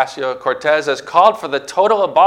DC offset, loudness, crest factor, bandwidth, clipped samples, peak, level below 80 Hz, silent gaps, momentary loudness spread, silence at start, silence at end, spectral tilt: under 0.1%; -15 LUFS; 14 dB; 13 kHz; 0.1%; 0 dBFS; -62 dBFS; none; 8 LU; 0 s; 0 s; -3.5 dB/octave